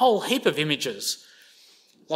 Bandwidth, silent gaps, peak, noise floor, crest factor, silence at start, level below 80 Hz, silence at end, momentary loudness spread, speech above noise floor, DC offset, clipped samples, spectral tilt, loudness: 16 kHz; none; -6 dBFS; -56 dBFS; 20 dB; 0 s; -74 dBFS; 0 s; 8 LU; 32 dB; under 0.1%; under 0.1%; -3 dB/octave; -25 LUFS